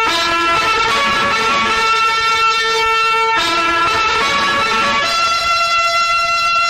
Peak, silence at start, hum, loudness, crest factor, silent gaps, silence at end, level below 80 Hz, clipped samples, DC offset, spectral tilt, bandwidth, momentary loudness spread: -4 dBFS; 0 s; none; -13 LUFS; 10 dB; none; 0 s; -42 dBFS; under 0.1%; 0.2%; -1.5 dB/octave; 15 kHz; 1 LU